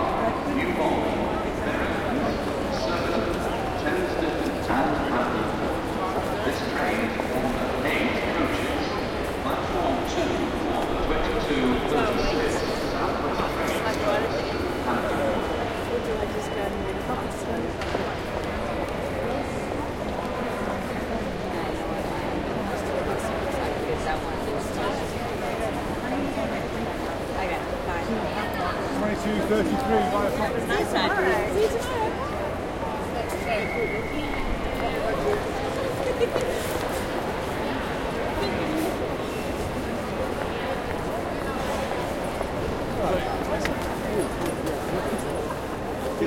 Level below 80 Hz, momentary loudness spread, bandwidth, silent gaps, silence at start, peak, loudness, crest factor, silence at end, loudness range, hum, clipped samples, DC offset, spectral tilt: -40 dBFS; 5 LU; 16.5 kHz; none; 0 s; -8 dBFS; -27 LUFS; 18 dB; 0 s; 4 LU; none; under 0.1%; under 0.1%; -5.5 dB/octave